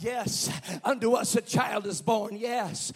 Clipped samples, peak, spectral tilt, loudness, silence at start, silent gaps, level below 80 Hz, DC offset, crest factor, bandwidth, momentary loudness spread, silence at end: under 0.1%; -12 dBFS; -3.5 dB/octave; -28 LUFS; 0 s; none; -64 dBFS; under 0.1%; 18 dB; 16 kHz; 5 LU; 0 s